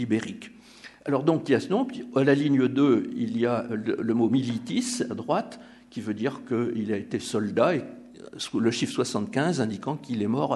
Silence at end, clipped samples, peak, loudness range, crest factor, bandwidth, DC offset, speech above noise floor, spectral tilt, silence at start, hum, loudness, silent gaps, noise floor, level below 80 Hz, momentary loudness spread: 0 s; under 0.1%; -8 dBFS; 4 LU; 18 dB; 12 kHz; under 0.1%; 23 dB; -6 dB/octave; 0 s; none; -26 LUFS; none; -49 dBFS; -70 dBFS; 16 LU